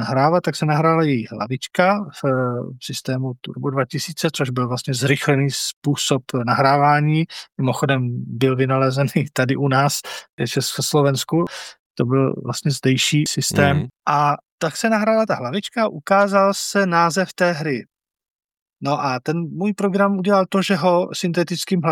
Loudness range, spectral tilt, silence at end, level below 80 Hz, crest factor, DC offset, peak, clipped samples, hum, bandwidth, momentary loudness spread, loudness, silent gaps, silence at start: 3 LU; -5 dB/octave; 0 s; -60 dBFS; 18 dB; under 0.1%; 0 dBFS; under 0.1%; none; 17 kHz; 8 LU; -19 LUFS; 5.73-5.82 s, 10.29-10.38 s, 11.79-11.94 s, 14.51-14.58 s, 18.30-18.39 s, 18.62-18.66 s; 0 s